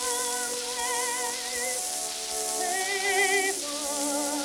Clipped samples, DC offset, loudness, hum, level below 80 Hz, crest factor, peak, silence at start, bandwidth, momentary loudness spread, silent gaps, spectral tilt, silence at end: under 0.1%; under 0.1%; -27 LUFS; none; -64 dBFS; 18 dB; -10 dBFS; 0 s; 19 kHz; 6 LU; none; 0.5 dB/octave; 0 s